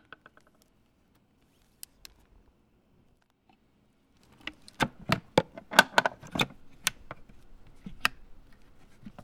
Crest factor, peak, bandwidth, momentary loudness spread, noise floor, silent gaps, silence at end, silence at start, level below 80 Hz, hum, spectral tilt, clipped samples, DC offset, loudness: 34 dB; 0 dBFS; over 20 kHz; 27 LU; -67 dBFS; none; 0.15 s; 4.45 s; -56 dBFS; none; -3 dB/octave; under 0.1%; under 0.1%; -28 LUFS